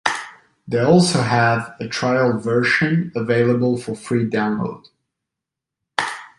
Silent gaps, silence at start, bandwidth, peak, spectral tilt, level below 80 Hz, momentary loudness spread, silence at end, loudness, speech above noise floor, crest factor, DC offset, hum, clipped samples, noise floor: none; 0.05 s; 11.5 kHz; 0 dBFS; -5.5 dB/octave; -56 dBFS; 11 LU; 0.1 s; -19 LUFS; 66 dB; 18 dB; under 0.1%; none; under 0.1%; -84 dBFS